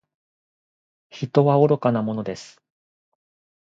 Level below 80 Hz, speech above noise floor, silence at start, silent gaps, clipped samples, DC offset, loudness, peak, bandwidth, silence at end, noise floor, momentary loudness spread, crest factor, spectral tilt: -66 dBFS; over 70 dB; 1.15 s; none; under 0.1%; under 0.1%; -20 LUFS; -2 dBFS; 7.8 kHz; 1.25 s; under -90 dBFS; 16 LU; 22 dB; -8 dB/octave